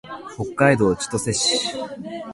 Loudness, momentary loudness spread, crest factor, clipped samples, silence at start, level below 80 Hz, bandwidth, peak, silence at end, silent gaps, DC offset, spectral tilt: -20 LUFS; 15 LU; 20 dB; under 0.1%; 0.05 s; -50 dBFS; 11.5 kHz; -2 dBFS; 0 s; none; under 0.1%; -3.5 dB/octave